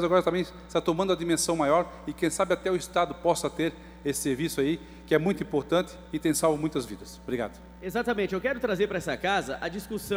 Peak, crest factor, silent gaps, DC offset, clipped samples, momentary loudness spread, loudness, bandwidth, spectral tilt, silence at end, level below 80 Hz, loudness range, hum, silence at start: -10 dBFS; 18 dB; none; under 0.1%; under 0.1%; 9 LU; -28 LUFS; over 20 kHz; -4.5 dB/octave; 0 s; -52 dBFS; 3 LU; none; 0 s